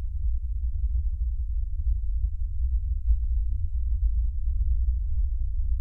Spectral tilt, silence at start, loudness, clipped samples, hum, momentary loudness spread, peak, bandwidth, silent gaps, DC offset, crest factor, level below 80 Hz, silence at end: -11 dB/octave; 0 s; -30 LUFS; under 0.1%; none; 4 LU; -10 dBFS; 0.2 kHz; none; under 0.1%; 14 dB; -26 dBFS; 0 s